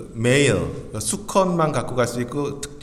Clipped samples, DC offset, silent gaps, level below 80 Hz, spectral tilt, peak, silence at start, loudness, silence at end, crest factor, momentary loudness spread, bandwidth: under 0.1%; under 0.1%; none; -44 dBFS; -4.5 dB/octave; -4 dBFS; 0 s; -21 LUFS; 0 s; 18 dB; 9 LU; 15.5 kHz